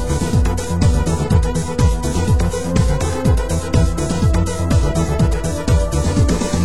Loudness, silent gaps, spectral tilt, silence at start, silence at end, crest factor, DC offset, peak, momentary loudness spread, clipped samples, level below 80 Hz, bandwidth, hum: -17 LUFS; none; -6 dB/octave; 0 s; 0 s; 14 dB; 3%; -2 dBFS; 2 LU; under 0.1%; -20 dBFS; 16 kHz; none